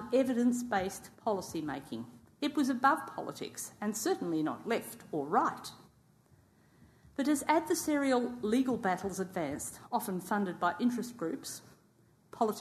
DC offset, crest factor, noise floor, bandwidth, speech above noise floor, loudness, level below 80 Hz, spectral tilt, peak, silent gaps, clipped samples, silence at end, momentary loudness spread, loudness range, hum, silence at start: under 0.1%; 20 dB; -66 dBFS; 13.5 kHz; 33 dB; -33 LUFS; -68 dBFS; -4.5 dB/octave; -14 dBFS; none; under 0.1%; 0 s; 12 LU; 3 LU; none; 0 s